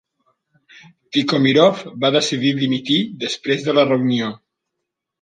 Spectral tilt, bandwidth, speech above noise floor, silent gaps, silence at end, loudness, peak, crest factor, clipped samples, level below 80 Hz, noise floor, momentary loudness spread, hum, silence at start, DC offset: -5 dB/octave; 9.4 kHz; 62 dB; none; 0.85 s; -18 LUFS; -2 dBFS; 18 dB; under 0.1%; -66 dBFS; -80 dBFS; 8 LU; none; 1.1 s; under 0.1%